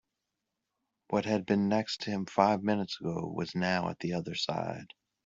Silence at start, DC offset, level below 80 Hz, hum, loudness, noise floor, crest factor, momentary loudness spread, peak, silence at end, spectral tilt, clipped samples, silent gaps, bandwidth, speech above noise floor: 1.1 s; under 0.1%; -68 dBFS; none; -32 LUFS; -86 dBFS; 22 dB; 8 LU; -10 dBFS; 0.4 s; -6 dB/octave; under 0.1%; none; 7.8 kHz; 55 dB